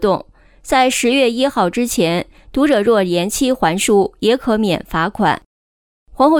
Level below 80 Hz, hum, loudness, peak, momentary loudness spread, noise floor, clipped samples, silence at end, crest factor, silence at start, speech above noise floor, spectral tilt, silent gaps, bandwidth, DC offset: -42 dBFS; none; -16 LUFS; -2 dBFS; 5 LU; under -90 dBFS; under 0.1%; 0 s; 12 dB; 0 s; over 75 dB; -4 dB/octave; 5.46-6.06 s; 19.5 kHz; under 0.1%